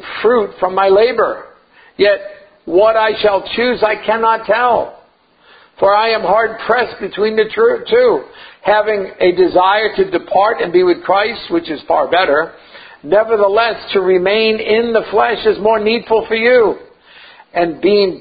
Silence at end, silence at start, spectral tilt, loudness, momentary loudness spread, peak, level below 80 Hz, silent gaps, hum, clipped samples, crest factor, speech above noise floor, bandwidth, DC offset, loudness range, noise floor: 0 s; 0 s; -8.5 dB/octave; -13 LUFS; 7 LU; 0 dBFS; -50 dBFS; none; none; under 0.1%; 14 dB; 37 dB; 5 kHz; under 0.1%; 2 LU; -50 dBFS